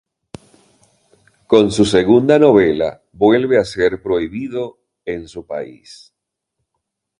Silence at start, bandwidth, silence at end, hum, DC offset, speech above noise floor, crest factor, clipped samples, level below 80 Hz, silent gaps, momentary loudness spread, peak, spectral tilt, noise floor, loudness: 1.5 s; 11 kHz; 1.45 s; none; under 0.1%; 61 dB; 16 dB; under 0.1%; -48 dBFS; none; 17 LU; 0 dBFS; -6 dB/octave; -76 dBFS; -15 LUFS